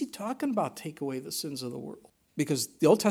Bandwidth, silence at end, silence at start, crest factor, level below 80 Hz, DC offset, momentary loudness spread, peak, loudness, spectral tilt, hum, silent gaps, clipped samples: 18 kHz; 0 s; 0 s; 22 dB; -74 dBFS; under 0.1%; 17 LU; -8 dBFS; -31 LUFS; -5 dB/octave; none; none; under 0.1%